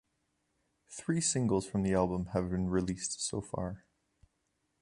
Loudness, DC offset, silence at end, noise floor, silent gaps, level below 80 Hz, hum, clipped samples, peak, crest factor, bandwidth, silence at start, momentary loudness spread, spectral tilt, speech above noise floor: -33 LUFS; under 0.1%; 1.05 s; -80 dBFS; none; -54 dBFS; none; under 0.1%; -14 dBFS; 20 dB; 11.5 kHz; 0.9 s; 11 LU; -5 dB/octave; 47 dB